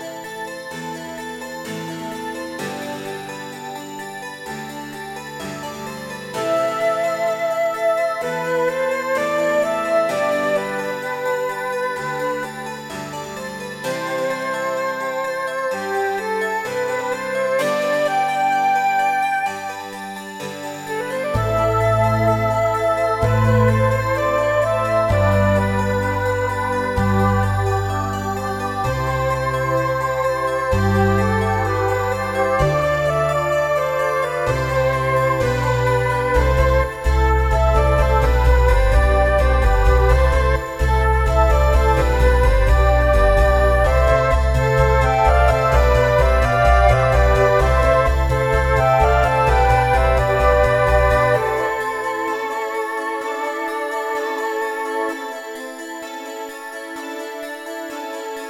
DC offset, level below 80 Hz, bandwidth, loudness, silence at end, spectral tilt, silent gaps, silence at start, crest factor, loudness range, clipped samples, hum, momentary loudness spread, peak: under 0.1%; -24 dBFS; 15 kHz; -18 LUFS; 0 s; -6 dB/octave; none; 0 s; 18 dB; 10 LU; under 0.1%; none; 14 LU; 0 dBFS